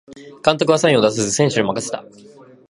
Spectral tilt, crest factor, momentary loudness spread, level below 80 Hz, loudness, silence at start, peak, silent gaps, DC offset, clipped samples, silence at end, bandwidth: -4 dB/octave; 18 dB; 11 LU; -58 dBFS; -17 LUFS; 0.1 s; 0 dBFS; none; under 0.1%; under 0.1%; 0.7 s; 11.5 kHz